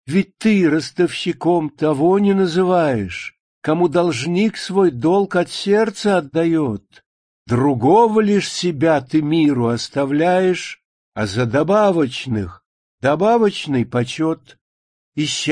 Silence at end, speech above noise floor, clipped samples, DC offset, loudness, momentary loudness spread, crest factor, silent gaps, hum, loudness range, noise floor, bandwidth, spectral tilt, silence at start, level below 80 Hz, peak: 0 s; over 73 dB; under 0.1%; under 0.1%; -17 LUFS; 9 LU; 14 dB; 3.40-3.62 s, 7.06-7.46 s, 10.85-11.12 s, 12.66-12.98 s, 14.61-15.12 s; none; 2 LU; under -90 dBFS; 10.5 kHz; -6 dB/octave; 0.05 s; -54 dBFS; -2 dBFS